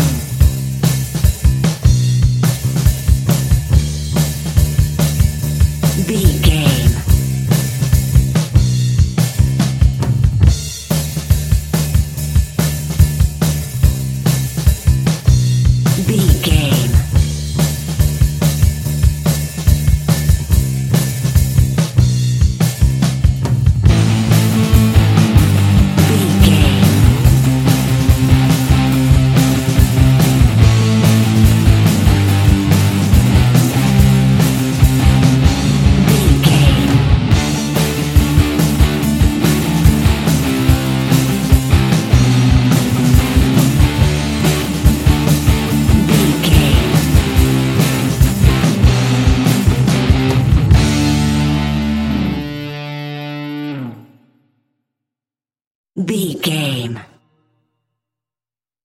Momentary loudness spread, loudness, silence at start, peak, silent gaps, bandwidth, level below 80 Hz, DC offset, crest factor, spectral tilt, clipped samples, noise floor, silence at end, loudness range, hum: 6 LU; -13 LUFS; 0 s; 0 dBFS; 55.67-55.84 s; 17 kHz; -18 dBFS; under 0.1%; 12 dB; -6 dB/octave; under 0.1%; under -90 dBFS; 1.85 s; 5 LU; none